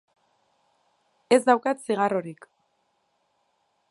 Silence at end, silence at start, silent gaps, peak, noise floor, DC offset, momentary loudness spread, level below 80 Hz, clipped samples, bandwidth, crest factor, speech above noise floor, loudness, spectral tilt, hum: 1.55 s; 1.3 s; none; -4 dBFS; -72 dBFS; under 0.1%; 10 LU; -80 dBFS; under 0.1%; 11.5 kHz; 24 dB; 49 dB; -23 LUFS; -4.5 dB/octave; none